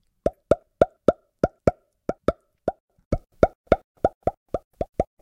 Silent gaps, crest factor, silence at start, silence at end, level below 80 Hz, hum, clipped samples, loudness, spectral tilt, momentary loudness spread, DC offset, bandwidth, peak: 2.80-2.88 s, 3.05-3.11 s, 3.55-3.64 s, 3.84-3.95 s, 4.15-4.21 s, 4.37-4.46 s, 4.64-4.71 s; 26 dB; 0.25 s; 0.2 s; -40 dBFS; none; under 0.1%; -26 LUFS; -8 dB/octave; 11 LU; under 0.1%; 10.5 kHz; 0 dBFS